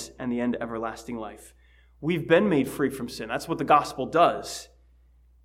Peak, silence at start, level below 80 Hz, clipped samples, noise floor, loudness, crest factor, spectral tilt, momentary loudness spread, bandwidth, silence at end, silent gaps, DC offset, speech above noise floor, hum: -6 dBFS; 0 s; -56 dBFS; under 0.1%; -58 dBFS; -26 LUFS; 20 dB; -5.5 dB/octave; 15 LU; 16 kHz; 0.8 s; none; under 0.1%; 32 dB; none